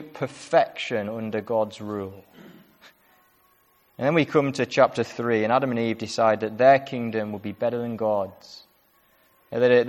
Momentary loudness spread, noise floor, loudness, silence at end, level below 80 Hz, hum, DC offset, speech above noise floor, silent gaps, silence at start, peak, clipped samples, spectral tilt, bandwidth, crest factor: 13 LU; -62 dBFS; -24 LUFS; 0 s; -68 dBFS; none; under 0.1%; 39 dB; none; 0 s; -4 dBFS; under 0.1%; -6 dB/octave; 13.5 kHz; 20 dB